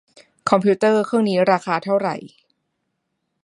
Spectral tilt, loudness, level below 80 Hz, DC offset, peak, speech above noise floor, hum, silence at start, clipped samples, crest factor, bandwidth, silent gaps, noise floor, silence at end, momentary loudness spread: -6.5 dB/octave; -19 LUFS; -68 dBFS; under 0.1%; 0 dBFS; 57 dB; none; 0.45 s; under 0.1%; 20 dB; 11 kHz; none; -75 dBFS; 1.15 s; 10 LU